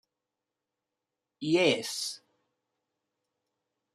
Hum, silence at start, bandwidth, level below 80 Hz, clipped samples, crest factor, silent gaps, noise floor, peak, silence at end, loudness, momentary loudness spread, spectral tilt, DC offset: none; 1.4 s; 15 kHz; -82 dBFS; under 0.1%; 24 dB; none; -88 dBFS; -12 dBFS; 1.8 s; -29 LUFS; 14 LU; -3.5 dB/octave; under 0.1%